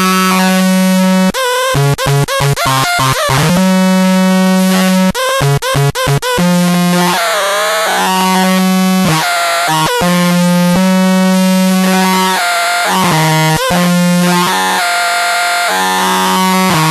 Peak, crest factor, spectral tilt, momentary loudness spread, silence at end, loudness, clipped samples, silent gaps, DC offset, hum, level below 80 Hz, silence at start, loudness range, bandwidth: 0 dBFS; 10 dB; -4.5 dB/octave; 2 LU; 0 s; -10 LUFS; under 0.1%; none; under 0.1%; none; -40 dBFS; 0 s; 1 LU; 13.5 kHz